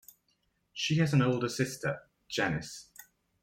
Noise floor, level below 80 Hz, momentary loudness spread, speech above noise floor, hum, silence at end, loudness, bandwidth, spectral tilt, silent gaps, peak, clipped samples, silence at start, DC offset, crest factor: -75 dBFS; -64 dBFS; 19 LU; 45 dB; none; 0.4 s; -31 LUFS; 16.5 kHz; -5 dB/octave; none; -14 dBFS; under 0.1%; 0.75 s; under 0.1%; 18 dB